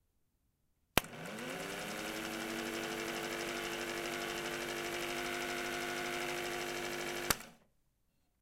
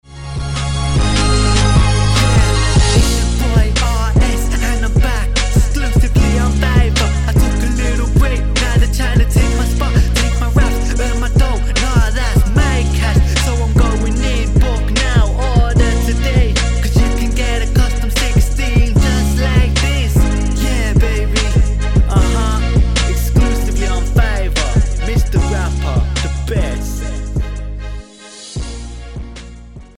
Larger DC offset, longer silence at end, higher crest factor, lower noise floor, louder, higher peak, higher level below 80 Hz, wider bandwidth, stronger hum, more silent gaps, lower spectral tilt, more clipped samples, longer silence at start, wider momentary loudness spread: neither; first, 0.85 s vs 0.15 s; first, 38 dB vs 12 dB; first, -78 dBFS vs -35 dBFS; second, -39 LUFS vs -15 LUFS; second, -4 dBFS vs 0 dBFS; second, -62 dBFS vs -14 dBFS; about the same, 16.5 kHz vs 15.5 kHz; neither; neither; second, -2.5 dB/octave vs -5 dB/octave; neither; first, 0.95 s vs 0.1 s; second, 6 LU vs 9 LU